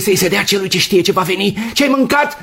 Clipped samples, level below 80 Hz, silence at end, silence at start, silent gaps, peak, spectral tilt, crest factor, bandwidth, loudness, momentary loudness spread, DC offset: under 0.1%; -46 dBFS; 0 s; 0 s; none; 0 dBFS; -3.5 dB/octave; 14 dB; 16.5 kHz; -13 LUFS; 4 LU; under 0.1%